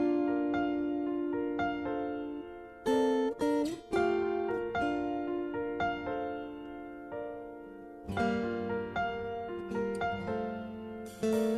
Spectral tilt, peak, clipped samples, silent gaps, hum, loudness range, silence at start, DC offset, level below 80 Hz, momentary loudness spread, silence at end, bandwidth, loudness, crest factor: -6.5 dB/octave; -18 dBFS; under 0.1%; none; none; 5 LU; 0 s; under 0.1%; -60 dBFS; 13 LU; 0 s; 13.5 kHz; -34 LUFS; 16 dB